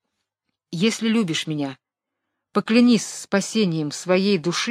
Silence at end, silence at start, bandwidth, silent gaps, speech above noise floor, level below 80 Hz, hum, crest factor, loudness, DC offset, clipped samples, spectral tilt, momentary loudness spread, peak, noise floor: 0 s; 0.7 s; 13.5 kHz; none; 61 dB; -68 dBFS; none; 18 dB; -21 LUFS; under 0.1%; under 0.1%; -4.5 dB/octave; 10 LU; -4 dBFS; -82 dBFS